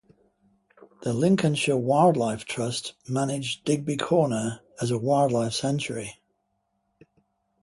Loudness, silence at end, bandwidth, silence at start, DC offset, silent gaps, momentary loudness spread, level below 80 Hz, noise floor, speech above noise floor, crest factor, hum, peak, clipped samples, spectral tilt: -25 LUFS; 1.5 s; 11.5 kHz; 1 s; under 0.1%; none; 11 LU; -62 dBFS; -75 dBFS; 50 dB; 20 dB; none; -6 dBFS; under 0.1%; -5.5 dB/octave